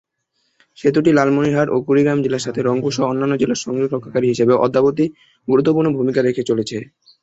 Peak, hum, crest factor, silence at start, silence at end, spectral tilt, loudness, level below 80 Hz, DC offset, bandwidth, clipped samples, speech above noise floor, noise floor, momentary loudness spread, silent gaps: -2 dBFS; none; 16 dB; 0.8 s; 0.4 s; -6.5 dB/octave; -17 LUFS; -56 dBFS; under 0.1%; 8.2 kHz; under 0.1%; 52 dB; -68 dBFS; 7 LU; none